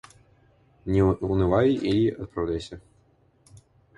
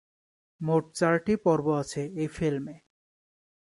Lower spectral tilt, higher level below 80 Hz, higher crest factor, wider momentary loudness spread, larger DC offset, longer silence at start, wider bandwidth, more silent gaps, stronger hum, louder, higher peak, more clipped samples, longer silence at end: first, -8 dB/octave vs -6.5 dB/octave; first, -42 dBFS vs -60 dBFS; about the same, 18 dB vs 20 dB; first, 17 LU vs 10 LU; neither; first, 0.85 s vs 0.6 s; about the same, 11.5 kHz vs 11.5 kHz; neither; neither; first, -24 LUFS vs -28 LUFS; about the same, -8 dBFS vs -10 dBFS; neither; first, 1.2 s vs 0.95 s